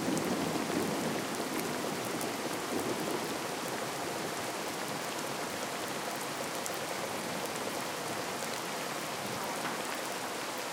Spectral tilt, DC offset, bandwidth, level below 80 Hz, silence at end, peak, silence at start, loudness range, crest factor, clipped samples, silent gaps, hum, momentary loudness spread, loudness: -3 dB/octave; under 0.1%; 18 kHz; -72 dBFS; 0 s; -12 dBFS; 0 s; 2 LU; 24 dB; under 0.1%; none; none; 3 LU; -35 LUFS